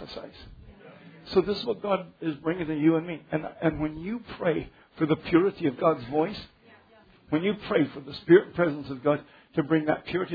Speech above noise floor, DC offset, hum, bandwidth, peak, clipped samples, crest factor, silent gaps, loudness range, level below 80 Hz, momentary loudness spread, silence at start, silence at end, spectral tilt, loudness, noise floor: 31 dB; under 0.1%; none; 5 kHz; -6 dBFS; under 0.1%; 20 dB; none; 3 LU; -56 dBFS; 11 LU; 0 s; 0 s; -9 dB/octave; -27 LUFS; -57 dBFS